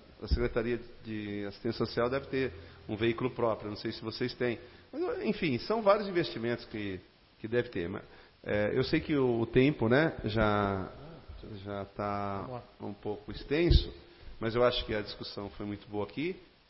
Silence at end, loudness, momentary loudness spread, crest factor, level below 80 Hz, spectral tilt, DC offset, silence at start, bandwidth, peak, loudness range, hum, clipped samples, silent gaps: 0.25 s; -32 LUFS; 16 LU; 22 dB; -44 dBFS; -10 dB/octave; under 0.1%; 0.1 s; 5.8 kHz; -10 dBFS; 5 LU; none; under 0.1%; none